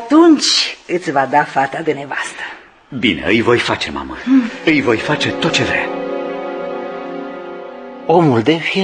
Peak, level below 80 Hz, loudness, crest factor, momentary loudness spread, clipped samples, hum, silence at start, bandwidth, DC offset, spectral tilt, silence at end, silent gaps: 0 dBFS; -48 dBFS; -15 LUFS; 16 dB; 15 LU; under 0.1%; none; 0 s; 10 kHz; under 0.1%; -4.5 dB/octave; 0 s; none